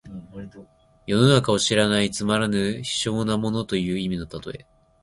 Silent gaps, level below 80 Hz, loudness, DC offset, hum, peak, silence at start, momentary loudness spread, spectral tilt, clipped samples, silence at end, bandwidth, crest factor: none; -50 dBFS; -22 LUFS; under 0.1%; none; -4 dBFS; 0.05 s; 22 LU; -5 dB/octave; under 0.1%; 0.45 s; 11.5 kHz; 20 dB